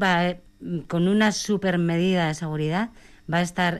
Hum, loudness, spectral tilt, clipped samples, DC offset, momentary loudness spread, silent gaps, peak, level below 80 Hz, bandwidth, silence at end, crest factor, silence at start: none; -24 LUFS; -5.5 dB/octave; under 0.1%; under 0.1%; 12 LU; none; -12 dBFS; -52 dBFS; 12.5 kHz; 0 s; 12 dB; 0 s